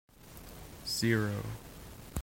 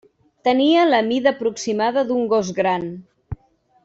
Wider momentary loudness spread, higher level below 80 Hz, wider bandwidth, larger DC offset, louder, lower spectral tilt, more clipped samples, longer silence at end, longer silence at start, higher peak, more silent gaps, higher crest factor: about the same, 20 LU vs 21 LU; second, -56 dBFS vs -50 dBFS; first, 16.5 kHz vs 8 kHz; neither; second, -34 LUFS vs -19 LUFS; about the same, -4.5 dB/octave vs -5 dB/octave; neither; second, 0 s vs 0.5 s; second, 0.2 s vs 0.45 s; second, -16 dBFS vs -4 dBFS; neither; about the same, 20 dB vs 16 dB